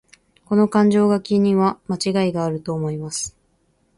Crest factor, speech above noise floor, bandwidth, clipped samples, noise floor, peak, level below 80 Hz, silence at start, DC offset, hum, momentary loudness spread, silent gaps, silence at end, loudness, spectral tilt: 16 dB; 45 dB; 11.5 kHz; under 0.1%; -63 dBFS; -4 dBFS; -56 dBFS; 0.5 s; under 0.1%; none; 10 LU; none; 0.7 s; -20 LUFS; -6 dB/octave